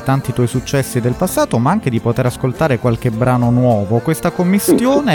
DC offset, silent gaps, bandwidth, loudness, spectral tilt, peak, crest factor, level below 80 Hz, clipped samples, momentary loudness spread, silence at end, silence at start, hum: under 0.1%; none; 19 kHz; -15 LUFS; -6.5 dB/octave; -2 dBFS; 12 dB; -40 dBFS; under 0.1%; 5 LU; 0 s; 0 s; none